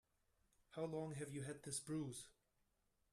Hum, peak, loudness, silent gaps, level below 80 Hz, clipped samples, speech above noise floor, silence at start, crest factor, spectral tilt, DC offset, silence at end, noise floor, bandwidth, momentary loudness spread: none; -32 dBFS; -49 LUFS; none; -78 dBFS; under 0.1%; 36 dB; 0.7 s; 20 dB; -5 dB/octave; under 0.1%; 0.8 s; -84 dBFS; 14 kHz; 10 LU